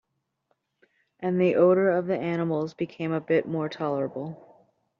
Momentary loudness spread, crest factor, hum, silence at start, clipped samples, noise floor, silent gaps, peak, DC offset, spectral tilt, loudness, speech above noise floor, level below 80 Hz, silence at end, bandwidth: 12 LU; 18 dB; none; 1.2 s; under 0.1%; -75 dBFS; none; -8 dBFS; under 0.1%; -7 dB/octave; -26 LUFS; 50 dB; -72 dBFS; 0.65 s; 6.8 kHz